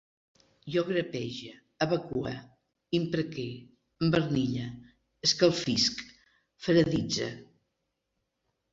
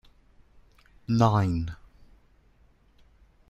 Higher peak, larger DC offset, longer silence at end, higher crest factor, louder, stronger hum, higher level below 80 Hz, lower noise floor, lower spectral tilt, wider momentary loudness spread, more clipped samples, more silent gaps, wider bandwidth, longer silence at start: about the same, -10 dBFS vs -8 dBFS; neither; second, 1.3 s vs 1.75 s; about the same, 22 dB vs 22 dB; second, -29 LUFS vs -26 LUFS; neither; second, -60 dBFS vs -50 dBFS; first, -82 dBFS vs -61 dBFS; second, -5 dB/octave vs -8 dB/octave; second, 18 LU vs 24 LU; neither; neither; about the same, 8 kHz vs 8.2 kHz; second, 0.65 s vs 1.1 s